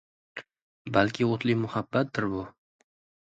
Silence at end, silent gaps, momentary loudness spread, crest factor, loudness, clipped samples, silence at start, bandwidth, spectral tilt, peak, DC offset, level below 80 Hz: 0.75 s; 0.62-0.85 s; 18 LU; 24 dB; -28 LUFS; under 0.1%; 0.35 s; 8 kHz; -7 dB/octave; -6 dBFS; under 0.1%; -60 dBFS